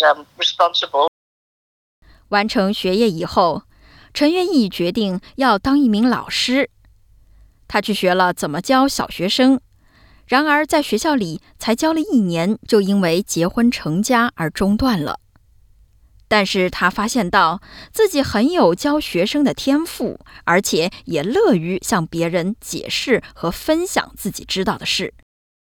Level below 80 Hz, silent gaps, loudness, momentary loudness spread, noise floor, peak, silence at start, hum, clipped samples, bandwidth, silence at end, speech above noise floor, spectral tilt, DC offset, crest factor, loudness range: -46 dBFS; 1.08-2.02 s; -18 LUFS; 8 LU; -51 dBFS; -2 dBFS; 0 s; none; under 0.1%; 19 kHz; 0.55 s; 34 dB; -4.5 dB/octave; under 0.1%; 16 dB; 2 LU